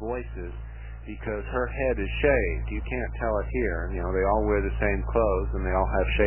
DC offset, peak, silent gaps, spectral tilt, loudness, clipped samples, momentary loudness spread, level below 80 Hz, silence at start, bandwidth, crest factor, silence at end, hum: 0.2%; -8 dBFS; none; -10.5 dB/octave; -27 LUFS; under 0.1%; 14 LU; -32 dBFS; 0 s; 3.2 kHz; 18 dB; 0 s; none